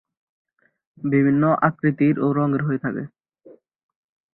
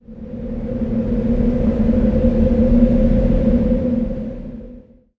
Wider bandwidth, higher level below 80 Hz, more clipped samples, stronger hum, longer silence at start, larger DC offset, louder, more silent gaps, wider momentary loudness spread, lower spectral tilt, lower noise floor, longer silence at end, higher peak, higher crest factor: second, 4.1 kHz vs 4.6 kHz; second, -62 dBFS vs -22 dBFS; neither; neither; first, 1 s vs 0.1 s; neither; second, -20 LUFS vs -17 LUFS; neither; second, 12 LU vs 15 LU; first, -13.5 dB/octave vs -11 dB/octave; first, -51 dBFS vs -41 dBFS; first, 1.25 s vs 0.4 s; about the same, -4 dBFS vs -2 dBFS; about the same, 18 dB vs 16 dB